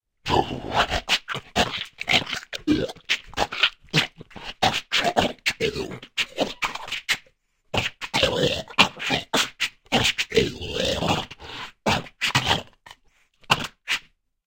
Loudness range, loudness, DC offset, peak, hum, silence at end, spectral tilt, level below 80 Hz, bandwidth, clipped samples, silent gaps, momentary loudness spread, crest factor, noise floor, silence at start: 3 LU; -24 LUFS; under 0.1%; 0 dBFS; none; 0.45 s; -3 dB/octave; -46 dBFS; 17 kHz; under 0.1%; none; 8 LU; 26 dB; -61 dBFS; 0.25 s